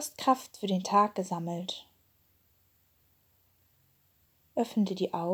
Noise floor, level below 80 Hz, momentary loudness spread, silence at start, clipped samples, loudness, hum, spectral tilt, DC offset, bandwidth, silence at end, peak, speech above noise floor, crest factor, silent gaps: -69 dBFS; -78 dBFS; 11 LU; 0 s; under 0.1%; -31 LUFS; none; -5.5 dB/octave; under 0.1%; over 20 kHz; 0 s; -12 dBFS; 39 dB; 22 dB; none